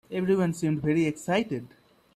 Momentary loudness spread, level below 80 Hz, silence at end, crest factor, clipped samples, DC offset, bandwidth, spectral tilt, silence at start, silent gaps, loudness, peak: 6 LU; -60 dBFS; 0.5 s; 16 dB; under 0.1%; under 0.1%; 14 kHz; -6.5 dB/octave; 0.1 s; none; -27 LUFS; -12 dBFS